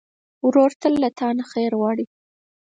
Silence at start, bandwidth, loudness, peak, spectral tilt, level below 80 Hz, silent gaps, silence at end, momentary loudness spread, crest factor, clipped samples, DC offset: 0.45 s; 9 kHz; -21 LUFS; -4 dBFS; -6.5 dB/octave; -64 dBFS; 0.76-0.80 s; 0.65 s; 8 LU; 16 dB; under 0.1%; under 0.1%